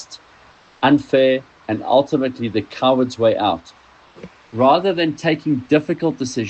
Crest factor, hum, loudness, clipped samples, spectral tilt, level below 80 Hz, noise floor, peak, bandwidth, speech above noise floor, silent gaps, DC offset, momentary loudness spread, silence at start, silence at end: 16 dB; none; -18 LUFS; under 0.1%; -6 dB/octave; -58 dBFS; -49 dBFS; -2 dBFS; 8.6 kHz; 31 dB; none; under 0.1%; 9 LU; 0 s; 0 s